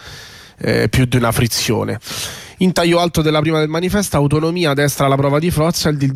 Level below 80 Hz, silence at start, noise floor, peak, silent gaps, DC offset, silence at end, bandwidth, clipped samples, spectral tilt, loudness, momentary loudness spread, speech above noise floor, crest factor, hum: -36 dBFS; 0 s; -37 dBFS; -4 dBFS; none; under 0.1%; 0 s; 16 kHz; under 0.1%; -5 dB/octave; -16 LUFS; 9 LU; 22 dB; 12 dB; none